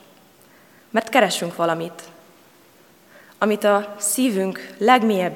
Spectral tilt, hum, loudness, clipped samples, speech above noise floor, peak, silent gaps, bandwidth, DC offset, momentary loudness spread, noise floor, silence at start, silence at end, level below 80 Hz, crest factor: -3.5 dB/octave; none; -20 LUFS; under 0.1%; 32 dB; 0 dBFS; none; 18 kHz; under 0.1%; 10 LU; -52 dBFS; 0.95 s; 0 s; -80 dBFS; 22 dB